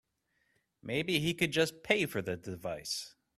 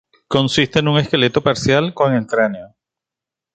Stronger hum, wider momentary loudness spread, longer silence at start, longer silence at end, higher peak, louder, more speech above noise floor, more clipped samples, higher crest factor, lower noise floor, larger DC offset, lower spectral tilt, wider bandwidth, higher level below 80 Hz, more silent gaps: neither; first, 10 LU vs 4 LU; first, 0.85 s vs 0.3 s; second, 0.3 s vs 0.9 s; second, -12 dBFS vs -2 dBFS; second, -33 LUFS vs -16 LUFS; second, 44 dB vs 70 dB; neither; first, 24 dB vs 16 dB; second, -78 dBFS vs -86 dBFS; neither; second, -4 dB/octave vs -5.5 dB/octave; first, 15.5 kHz vs 9 kHz; second, -66 dBFS vs -48 dBFS; neither